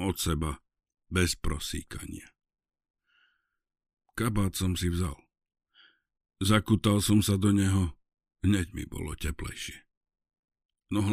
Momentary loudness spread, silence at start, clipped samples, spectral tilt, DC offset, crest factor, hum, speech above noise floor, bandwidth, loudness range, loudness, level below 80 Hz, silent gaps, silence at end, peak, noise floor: 16 LU; 0 s; under 0.1%; -5 dB/octave; under 0.1%; 20 dB; none; 46 dB; 15.5 kHz; 8 LU; -29 LUFS; -44 dBFS; 2.90-2.94 s, 9.97-10.01 s, 10.39-10.43 s, 10.65-10.69 s; 0 s; -10 dBFS; -74 dBFS